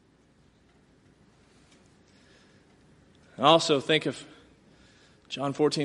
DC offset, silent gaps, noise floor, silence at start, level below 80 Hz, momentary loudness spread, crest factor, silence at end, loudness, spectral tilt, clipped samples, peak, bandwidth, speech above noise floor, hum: under 0.1%; none; -62 dBFS; 3.4 s; -70 dBFS; 24 LU; 26 dB; 0 s; -25 LUFS; -4 dB/octave; under 0.1%; -4 dBFS; 11.5 kHz; 38 dB; none